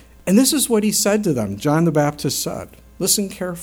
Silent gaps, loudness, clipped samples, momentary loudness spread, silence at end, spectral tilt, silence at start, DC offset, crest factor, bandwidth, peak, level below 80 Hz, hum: none; -18 LUFS; under 0.1%; 8 LU; 0 s; -4 dB/octave; 0.25 s; under 0.1%; 16 dB; over 20 kHz; -2 dBFS; -48 dBFS; none